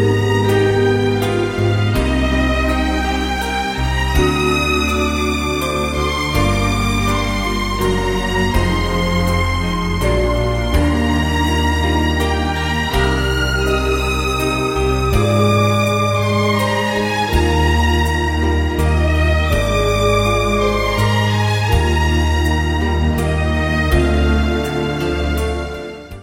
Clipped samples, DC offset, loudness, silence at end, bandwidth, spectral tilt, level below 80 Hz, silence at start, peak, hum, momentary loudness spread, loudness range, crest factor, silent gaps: under 0.1%; under 0.1%; -16 LUFS; 0 s; 16.5 kHz; -5.5 dB/octave; -22 dBFS; 0 s; 0 dBFS; none; 4 LU; 2 LU; 14 dB; none